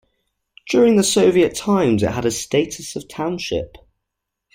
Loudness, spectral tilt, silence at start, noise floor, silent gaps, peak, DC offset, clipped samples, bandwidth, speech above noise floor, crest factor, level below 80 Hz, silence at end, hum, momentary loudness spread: -18 LUFS; -4.5 dB/octave; 0.65 s; -80 dBFS; none; -4 dBFS; under 0.1%; under 0.1%; 16.5 kHz; 62 dB; 16 dB; -48 dBFS; 0.8 s; none; 12 LU